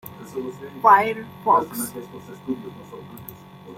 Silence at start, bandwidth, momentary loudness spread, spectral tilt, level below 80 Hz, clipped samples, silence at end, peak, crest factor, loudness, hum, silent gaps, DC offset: 0.05 s; 16.5 kHz; 24 LU; -4.5 dB/octave; -64 dBFS; under 0.1%; 0.05 s; -2 dBFS; 22 dB; -21 LUFS; none; none; under 0.1%